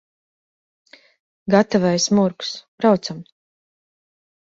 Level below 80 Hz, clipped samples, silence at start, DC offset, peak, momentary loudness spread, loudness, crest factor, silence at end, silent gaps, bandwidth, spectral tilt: -60 dBFS; under 0.1%; 1.45 s; under 0.1%; -2 dBFS; 14 LU; -19 LUFS; 20 dB; 1.3 s; 2.68-2.78 s; 7.8 kHz; -5 dB/octave